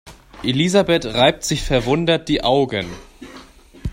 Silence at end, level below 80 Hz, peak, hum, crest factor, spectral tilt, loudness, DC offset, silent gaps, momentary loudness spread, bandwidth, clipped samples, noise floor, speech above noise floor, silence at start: 0 s; -36 dBFS; 0 dBFS; none; 18 dB; -4.5 dB/octave; -18 LUFS; under 0.1%; none; 17 LU; 16 kHz; under 0.1%; -43 dBFS; 25 dB; 0.05 s